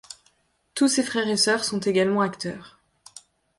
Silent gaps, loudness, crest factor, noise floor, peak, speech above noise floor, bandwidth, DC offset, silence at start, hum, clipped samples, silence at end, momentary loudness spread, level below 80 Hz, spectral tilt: none; -23 LUFS; 16 dB; -65 dBFS; -8 dBFS; 42 dB; 12 kHz; under 0.1%; 0.1 s; none; under 0.1%; 0.4 s; 19 LU; -66 dBFS; -3.5 dB/octave